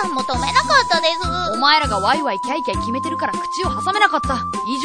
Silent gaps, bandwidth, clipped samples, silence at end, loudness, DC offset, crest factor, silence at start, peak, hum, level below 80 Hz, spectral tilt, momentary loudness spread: none; 10 kHz; under 0.1%; 0 s; -18 LUFS; under 0.1%; 18 dB; 0 s; 0 dBFS; none; -36 dBFS; -3.5 dB/octave; 8 LU